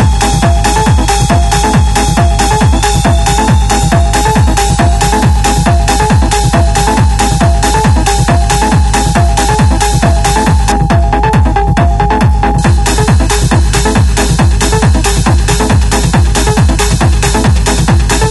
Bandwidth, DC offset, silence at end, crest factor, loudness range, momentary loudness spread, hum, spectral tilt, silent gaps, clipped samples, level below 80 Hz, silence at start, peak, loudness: 12 kHz; under 0.1%; 0 s; 8 dB; 0 LU; 1 LU; none; -5 dB/octave; none; under 0.1%; -12 dBFS; 0 s; 0 dBFS; -9 LUFS